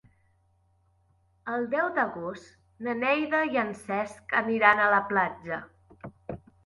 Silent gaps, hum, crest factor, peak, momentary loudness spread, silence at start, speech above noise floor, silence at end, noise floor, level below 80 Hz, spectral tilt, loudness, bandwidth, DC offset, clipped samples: none; none; 24 dB; -6 dBFS; 21 LU; 1.45 s; 40 dB; 0.3 s; -67 dBFS; -64 dBFS; -5.5 dB/octave; -27 LUFS; 11.5 kHz; under 0.1%; under 0.1%